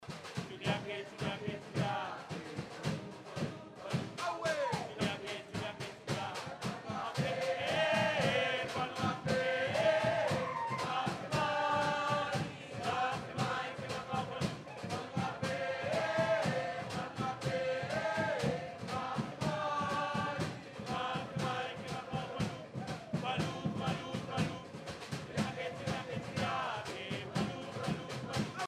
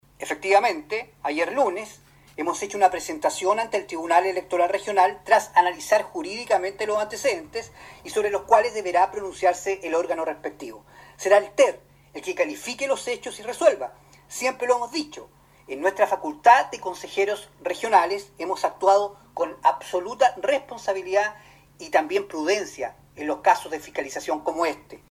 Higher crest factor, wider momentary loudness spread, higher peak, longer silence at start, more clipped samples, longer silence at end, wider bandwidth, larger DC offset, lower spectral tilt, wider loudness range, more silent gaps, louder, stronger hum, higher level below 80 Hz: about the same, 18 dB vs 22 dB; second, 9 LU vs 13 LU; second, -20 dBFS vs -2 dBFS; second, 0 s vs 0.2 s; neither; second, 0 s vs 0.15 s; about the same, 15.5 kHz vs 15.5 kHz; neither; first, -5 dB/octave vs -2.5 dB/octave; about the same, 6 LU vs 4 LU; neither; second, -37 LUFS vs -23 LUFS; neither; about the same, -64 dBFS vs -62 dBFS